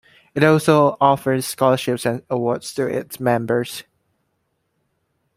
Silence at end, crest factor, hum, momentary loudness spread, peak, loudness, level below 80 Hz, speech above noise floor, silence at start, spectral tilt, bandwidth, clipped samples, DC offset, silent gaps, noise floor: 1.55 s; 18 dB; none; 9 LU; -2 dBFS; -19 LUFS; -60 dBFS; 52 dB; 0.35 s; -5.5 dB/octave; 16 kHz; under 0.1%; under 0.1%; none; -71 dBFS